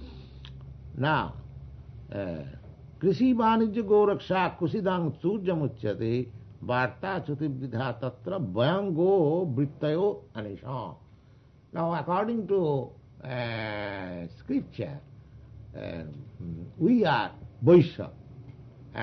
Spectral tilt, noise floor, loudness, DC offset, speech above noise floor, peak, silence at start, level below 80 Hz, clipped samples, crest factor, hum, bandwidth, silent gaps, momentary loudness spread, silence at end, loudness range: -9 dB/octave; -56 dBFS; -28 LUFS; under 0.1%; 29 dB; -8 dBFS; 0 s; -54 dBFS; under 0.1%; 20 dB; none; 6.2 kHz; none; 22 LU; 0 s; 7 LU